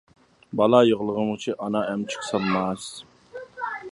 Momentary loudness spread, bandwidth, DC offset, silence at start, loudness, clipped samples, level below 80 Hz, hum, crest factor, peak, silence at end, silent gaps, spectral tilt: 22 LU; 11.5 kHz; under 0.1%; 0.5 s; -24 LUFS; under 0.1%; -62 dBFS; none; 22 dB; -2 dBFS; 0 s; none; -5.5 dB/octave